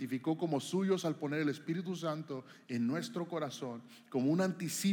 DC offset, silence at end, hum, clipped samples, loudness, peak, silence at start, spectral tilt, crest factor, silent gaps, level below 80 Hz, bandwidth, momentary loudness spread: under 0.1%; 0 s; none; under 0.1%; -36 LUFS; -20 dBFS; 0 s; -5.5 dB/octave; 16 dB; none; under -90 dBFS; 19 kHz; 10 LU